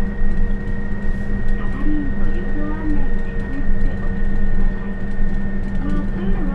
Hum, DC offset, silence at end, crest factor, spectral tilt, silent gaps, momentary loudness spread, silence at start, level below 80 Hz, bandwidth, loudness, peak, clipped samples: none; under 0.1%; 0 s; 12 dB; -9 dB/octave; none; 3 LU; 0 s; -18 dBFS; 3.2 kHz; -25 LUFS; -4 dBFS; under 0.1%